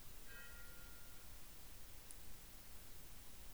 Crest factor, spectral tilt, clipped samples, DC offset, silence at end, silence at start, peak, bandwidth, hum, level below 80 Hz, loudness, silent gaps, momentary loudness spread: 24 dB; -2.5 dB/octave; under 0.1%; 0.2%; 0 s; 0 s; -32 dBFS; over 20 kHz; none; -62 dBFS; -56 LUFS; none; 2 LU